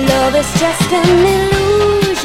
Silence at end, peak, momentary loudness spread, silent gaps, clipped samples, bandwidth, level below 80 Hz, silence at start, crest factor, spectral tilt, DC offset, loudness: 0 s; 0 dBFS; 3 LU; none; under 0.1%; 16.5 kHz; -30 dBFS; 0 s; 12 dB; -4.5 dB/octave; under 0.1%; -12 LUFS